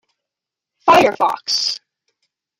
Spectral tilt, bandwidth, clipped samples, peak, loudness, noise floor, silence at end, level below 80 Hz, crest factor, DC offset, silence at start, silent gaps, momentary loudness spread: -2.5 dB/octave; 16 kHz; under 0.1%; -2 dBFS; -15 LUFS; -85 dBFS; 0.85 s; -56 dBFS; 18 dB; under 0.1%; 0.85 s; none; 9 LU